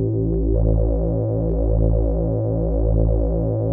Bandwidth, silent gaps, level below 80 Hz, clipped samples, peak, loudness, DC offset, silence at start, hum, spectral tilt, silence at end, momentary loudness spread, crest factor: 1.5 kHz; none; -22 dBFS; under 0.1%; -4 dBFS; -21 LUFS; under 0.1%; 0 s; none; -16 dB/octave; 0 s; 2 LU; 14 dB